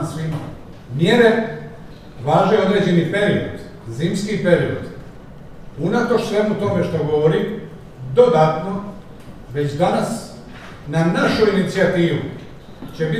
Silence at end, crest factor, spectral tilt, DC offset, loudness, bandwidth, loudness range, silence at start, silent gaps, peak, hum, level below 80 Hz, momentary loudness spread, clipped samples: 0 s; 18 dB; -6.5 dB/octave; 0.4%; -18 LUFS; 13.5 kHz; 3 LU; 0 s; none; 0 dBFS; none; -44 dBFS; 22 LU; under 0.1%